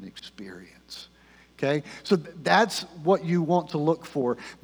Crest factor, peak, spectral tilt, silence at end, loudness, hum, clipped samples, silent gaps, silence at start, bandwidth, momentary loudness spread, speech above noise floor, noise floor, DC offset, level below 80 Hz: 22 dB; -6 dBFS; -5.5 dB/octave; 0.1 s; -25 LUFS; none; under 0.1%; none; 0 s; over 20 kHz; 20 LU; 30 dB; -56 dBFS; under 0.1%; -66 dBFS